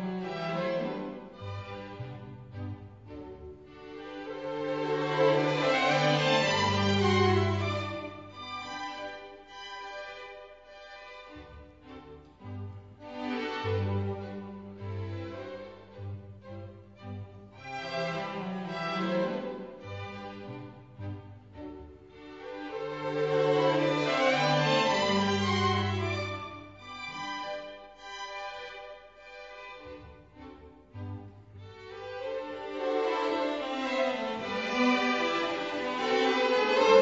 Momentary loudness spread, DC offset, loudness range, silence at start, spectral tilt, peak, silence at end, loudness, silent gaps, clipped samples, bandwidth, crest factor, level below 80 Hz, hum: 22 LU; under 0.1%; 17 LU; 0 s; -5.5 dB/octave; -8 dBFS; 0 s; -30 LUFS; none; under 0.1%; 7.8 kHz; 22 dB; -64 dBFS; none